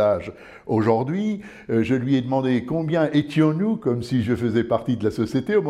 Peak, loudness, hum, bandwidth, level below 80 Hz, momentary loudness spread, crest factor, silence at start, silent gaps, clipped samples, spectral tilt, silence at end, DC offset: -4 dBFS; -22 LUFS; none; 12 kHz; -54 dBFS; 5 LU; 16 dB; 0 s; none; under 0.1%; -8 dB/octave; 0 s; under 0.1%